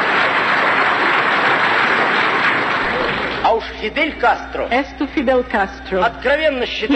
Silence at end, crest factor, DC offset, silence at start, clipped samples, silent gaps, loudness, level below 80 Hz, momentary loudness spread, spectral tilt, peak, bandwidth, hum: 0 s; 14 dB; under 0.1%; 0 s; under 0.1%; none; -16 LUFS; -40 dBFS; 6 LU; -4.5 dB/octave; -2 dBFS; 8.4 kHz; none